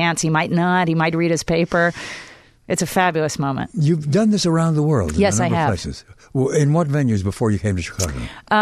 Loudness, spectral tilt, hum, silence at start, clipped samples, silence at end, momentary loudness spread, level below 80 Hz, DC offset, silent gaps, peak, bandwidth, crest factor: -19 LUFS; -5.5 dB/octave; none; 0 s; under 0.1%; 0 s; 8 LU; -40 dBFS; under 0.1%; none; -4 dBFS; 13.5 kHz; 14 dB